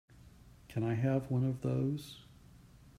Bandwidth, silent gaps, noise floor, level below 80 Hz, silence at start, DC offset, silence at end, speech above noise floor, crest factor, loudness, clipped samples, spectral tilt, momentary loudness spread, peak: 13.5 kHz; none; -58 dBFS; -62 dBFS; 0.25 s; under 0.1%; 0.75 s; 25 dB; 16 dB; -35 LUFS; under 0.1%; -8.5 dB/octave; 13 LU; -20 dBFS